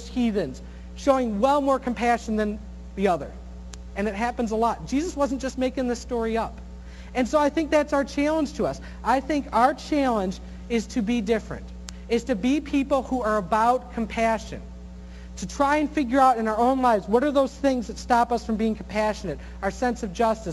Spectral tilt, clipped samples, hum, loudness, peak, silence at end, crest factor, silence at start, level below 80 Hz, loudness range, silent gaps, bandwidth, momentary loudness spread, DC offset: -5.5 dB/octave; under 0.1%; none; -24 LUFS; -6 dBFS; 0 s; 20 dB; 0 s; -40 dBFS; 4 LU; none; 12.5 kHz; 16 LU; under 0.1%